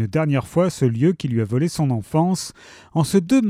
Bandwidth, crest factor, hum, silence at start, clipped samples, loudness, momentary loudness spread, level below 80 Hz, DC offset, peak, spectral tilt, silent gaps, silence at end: 15 kHz; 16 dB; none; 0 s; under 0.1%; -20 LUFS; 5 LU; -52 dBFS; under 0.1%; -4 dBFS; -7 dB/octave; none; 0 s